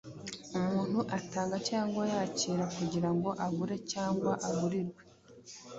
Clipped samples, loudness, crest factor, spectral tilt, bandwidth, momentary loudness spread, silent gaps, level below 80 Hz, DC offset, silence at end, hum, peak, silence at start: under 0.1%; -34 LUFS; 16 dB; -5.5 dB/octave; 8 kHz; 7 LU; none; -66 dBFS; under 0.1%; 0 s; none; -18 dBFS; 0.05 s